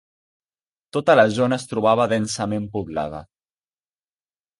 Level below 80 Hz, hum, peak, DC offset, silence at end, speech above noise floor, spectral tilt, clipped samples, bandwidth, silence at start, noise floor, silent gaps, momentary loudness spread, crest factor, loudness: -54 dBFS; none; -4 dBFS; under 0.1%; 1.35 s; over 70 dB; -5 dB/octave; under 0.1%; 11.5 kHz; 0.95 s; under -90 dBFS; none; 13 LU; 20 dB; -20 LUFS